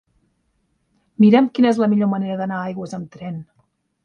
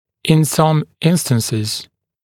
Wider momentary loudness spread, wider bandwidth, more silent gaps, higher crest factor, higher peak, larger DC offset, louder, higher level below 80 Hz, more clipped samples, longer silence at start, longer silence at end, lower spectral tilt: first, 18 LU vs 8 LU; second, 8.6 kHz vs 17 kHz; neither; about the same, 18 dB vs 16 dB; about the same, -2 dBFS vs 0 dBFS; neither; about the same, -17 LUFS vs -16 LUFS; second, -64 dBFS vs -54 dBFS; neither; first, 1.2 s vs 0.25 s; first, 0.6 s vs 0.4 s; first, -8 dB/octave vs -5.5 dB/octave